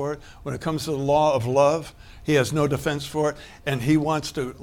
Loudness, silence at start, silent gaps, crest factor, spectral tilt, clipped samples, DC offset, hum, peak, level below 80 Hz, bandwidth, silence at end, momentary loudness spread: -23 LUFS; 0 s; none; 18 dB; -6 dB/octave; under 0.1%; under 0.1%; none; -6 dBFS; -48 dBFS; 17.5 kHz; 0 s; 12 LU